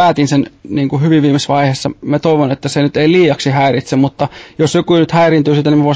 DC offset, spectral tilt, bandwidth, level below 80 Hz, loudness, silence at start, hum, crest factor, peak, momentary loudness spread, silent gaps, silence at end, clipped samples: under 0.1%; -6.5 dB/octave; 8 kHz; -48 dBFS; -12 LUFS; 0 s; none; 10 dB; 0 dBFS; 7 LU; none; 0 s; under 0.1%